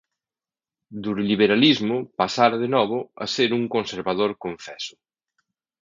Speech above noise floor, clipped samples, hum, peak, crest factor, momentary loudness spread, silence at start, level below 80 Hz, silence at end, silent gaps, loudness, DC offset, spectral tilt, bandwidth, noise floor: over 68 dB; under 0.1%; none; -2 dBFS; 22 dB; 16 LU; 0.9 s; -64 dBFS; 0.95 s; none; -21 LUFS; under 0.1%; -5 dB/octave; 7.6 kHz; under -90 dBFS